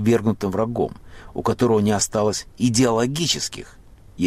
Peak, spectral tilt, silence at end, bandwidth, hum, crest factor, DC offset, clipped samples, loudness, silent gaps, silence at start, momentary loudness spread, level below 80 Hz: -6 dBFS; -4.5 dB/octave; 0 s; 15.5 kHz; none; 14 dB; under 0.1%; under 0.1%; -21 LUFS; none; 0 s; 9 LU; -46 dBFS